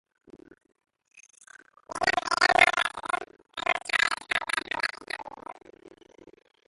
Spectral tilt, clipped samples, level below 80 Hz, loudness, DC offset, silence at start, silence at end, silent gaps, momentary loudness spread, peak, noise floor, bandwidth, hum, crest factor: -1 dB/octave; under 0.1%; -62 dBFS; -26 LUFS; under 0.1%; 0.35 s; 0.8 s; none; 20 LU; -2 dBFS; -54 dBFS; 12 kHz; none; 28 dB